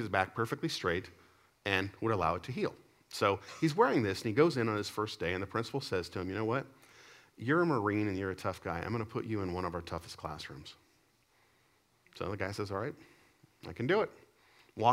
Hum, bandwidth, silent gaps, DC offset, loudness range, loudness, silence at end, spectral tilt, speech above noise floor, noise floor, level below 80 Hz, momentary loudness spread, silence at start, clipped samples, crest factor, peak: none; 16 kHz; none; under 0.1%; 11 LU; -34 LUFS; 0 s; -6 dB/octave; 37 dB; -71 dBFS; -64 dBFS; 14 LU; 0 s; under 0.1%; 24 dB; -12 dBFS